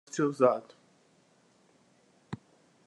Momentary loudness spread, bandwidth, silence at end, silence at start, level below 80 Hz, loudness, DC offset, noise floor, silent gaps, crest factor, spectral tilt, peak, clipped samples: 20 LU; 11 kHz; 0.5 s; 0.15 s; -80 dBFS; -28 LUFS; under 0.1%; -66 dBFS; none; 24 dB; -6 dB/octave; -10 dBFS; under 0.1%